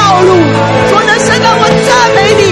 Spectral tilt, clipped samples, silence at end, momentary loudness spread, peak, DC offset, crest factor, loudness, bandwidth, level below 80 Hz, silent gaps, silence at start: -4.5 dB/octave; 2%; 0 s; 2 LU; 0 dBFS; under 0.1%; 6 dB; -6 LUFS; 13.5 kHz; -34 dBFS; none; 0 s